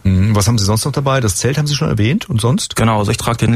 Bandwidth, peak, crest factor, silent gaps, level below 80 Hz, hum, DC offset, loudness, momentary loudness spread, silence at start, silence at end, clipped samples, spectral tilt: 15.5 kHz; -2 dBFS; 12 dB; none; -36 dBFS; none; under 0.1%; -15 LUFS; 3 LU; 0.05 s; 0 s; under 0.1%; -5 dB/octave